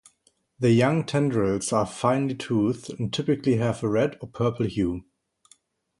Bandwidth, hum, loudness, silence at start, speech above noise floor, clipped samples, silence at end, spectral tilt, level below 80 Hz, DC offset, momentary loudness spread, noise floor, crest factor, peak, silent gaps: 11.5 kHz; none; -25 LUFS; 0.6 s; 43 dB; under 0.1%; 1 s; -6.5 dB/octave; -52 dBFS; under 0.1%; 7 LU; -67 dBFS; 18 dB; -6 dBFS; none